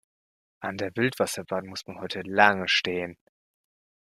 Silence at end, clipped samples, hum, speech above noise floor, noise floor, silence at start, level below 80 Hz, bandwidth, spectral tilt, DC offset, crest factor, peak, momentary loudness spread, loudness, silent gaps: 0.95 s; under 0.1%; none; over 63 dB; under -90 dBFS; 0.6 s; -68 dBFS; 15.5 kHz; -3.5 dB/octave; under 0.1%; 26 dB; -2 dBFS; 16 LU; -26 LUFS; none